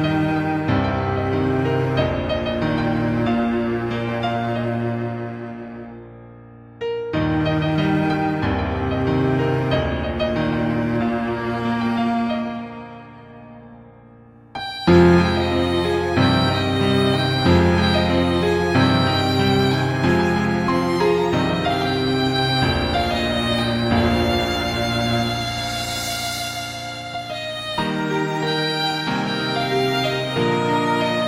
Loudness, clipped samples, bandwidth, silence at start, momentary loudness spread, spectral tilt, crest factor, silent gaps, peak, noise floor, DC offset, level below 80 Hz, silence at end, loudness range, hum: -20 LUFS; under 0.1%; 16 kHz; 0 s; 10 LU; -6 dB/octave; 16 dB; none; -4 dBFS; -46 dBFS; under 0.1%; -38 dBFS; 0 s; 7 LU; none